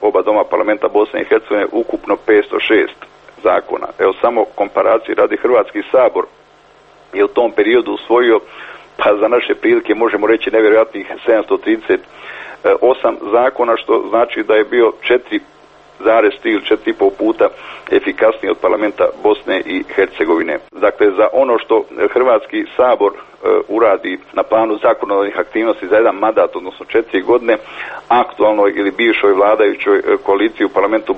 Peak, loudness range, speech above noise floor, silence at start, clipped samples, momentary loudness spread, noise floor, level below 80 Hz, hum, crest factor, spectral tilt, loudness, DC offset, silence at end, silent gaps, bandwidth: 0 dBFS; 2 LU; 32 dB; 0 s; under 0.1%; 7 LU; -46 dBFS; -52 dBFS; none; 14 dB; -6 dB/octave; -14 LUFS; under 0.1%; 0 s; none; 5.4 kHz